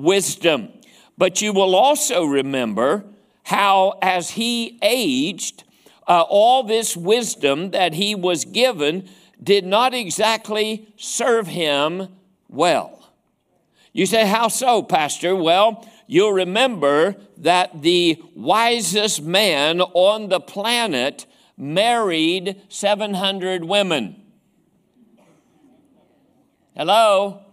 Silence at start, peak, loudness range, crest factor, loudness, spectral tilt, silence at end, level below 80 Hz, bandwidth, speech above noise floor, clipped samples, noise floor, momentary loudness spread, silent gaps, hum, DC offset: 0 s; 0 dBFS; 5 LU; 18 dB; -18 LUFS; -3 dB/octave; 0.15 s; -68 dBFS; 16 kHz; 47 dB; under 0.1%; -65 dBFS; 9 LU; none; none; under 0.1%